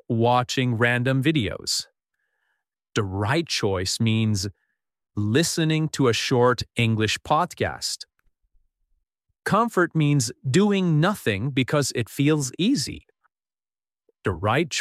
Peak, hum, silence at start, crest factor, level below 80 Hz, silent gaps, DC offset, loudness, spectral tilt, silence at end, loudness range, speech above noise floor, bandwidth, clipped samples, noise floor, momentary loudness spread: -6 dBFS; none; 0.1 s; 18 dB; -54 dBFS; none; under 0.1%; -23 LUFS; -5 dB/octave; 0 s; 3 LU; over 68 dB; 15 kHz; under 0.1%; under -90 dBFS; 8 LU